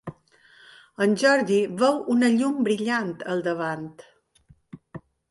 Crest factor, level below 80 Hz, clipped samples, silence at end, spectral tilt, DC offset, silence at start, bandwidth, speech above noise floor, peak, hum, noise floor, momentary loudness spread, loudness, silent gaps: 18 dB; -68 dBFS; under 0.1%; 0.3 s; -5 dB/octave; under 0.1%; 0.05 s; 11.5 kHz; 36 dB; -6 dBFS; none; -59 dBFS; 23 LU; -23 LUFS; none